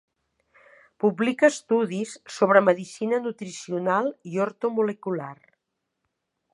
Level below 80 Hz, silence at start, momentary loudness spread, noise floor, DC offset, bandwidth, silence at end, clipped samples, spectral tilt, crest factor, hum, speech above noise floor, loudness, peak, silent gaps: -78 dBFS; 1.05 s; 13 LU; -80 dBFS; under 0.1%; 11.5 kHz; 1.2 s; under 0.1%; -5.5 dB/octave; 24 dB; none; 57 dB; -24 LUFS; -2 dBFS; none